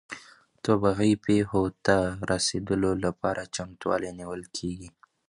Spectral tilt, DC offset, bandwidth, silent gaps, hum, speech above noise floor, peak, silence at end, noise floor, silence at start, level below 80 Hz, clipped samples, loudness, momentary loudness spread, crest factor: -5 dB/octave; under 0.1%; 11.5 kHz; none; none; 25 dB; -6 dBFS; 0.4 s; -52 dBFS; 0.1 s; -50 dBFS; under 0.1%; -27 LUFS; 12 LU; 20 dB